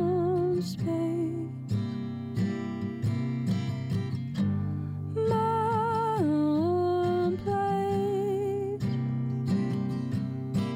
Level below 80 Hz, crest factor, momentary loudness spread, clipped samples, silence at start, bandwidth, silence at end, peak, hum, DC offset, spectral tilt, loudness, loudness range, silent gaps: -58 dBFS; 12 dB; 7 LU; under 0.1%; 0 s; 15.5 kHz; 0 s; -16 dBFS; none; under 0.1%; -8.5 dB/octave; -29 LUFS; 4 LU; none